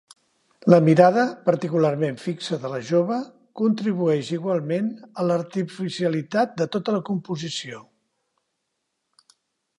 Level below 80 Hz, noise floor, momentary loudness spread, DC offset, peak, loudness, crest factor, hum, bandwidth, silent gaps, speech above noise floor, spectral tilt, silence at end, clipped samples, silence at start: -72 dBFS; -77 dBFS; 13 LU; under 0.1%; -2 dBFS; -22 LUFS; 22 dB; none; 11 kHz; none; 56 dB; -7 dB/octave; 1.95 s; under 0.1%; 0.65 s